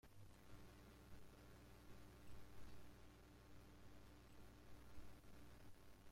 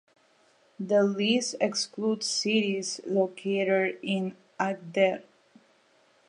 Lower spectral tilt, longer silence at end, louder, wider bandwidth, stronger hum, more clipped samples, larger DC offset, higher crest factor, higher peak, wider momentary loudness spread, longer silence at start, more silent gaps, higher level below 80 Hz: about the same, -5 dB/octave vs -4 dB/octave; second, 0 s vs 1.05 s; second, -66 LUFS vs -27 LUFS; first, 16.5 kHz vs 11.5 kHz; neither; neither; neither; about the same, 14 dB vs 18 dB; second, -46 dBFS vs -10 dBFS; second, 2 LU vs 7 LU; second, 0.05 s vs 0.8 s; neither; first, -68 dBFS vs -82 dBFS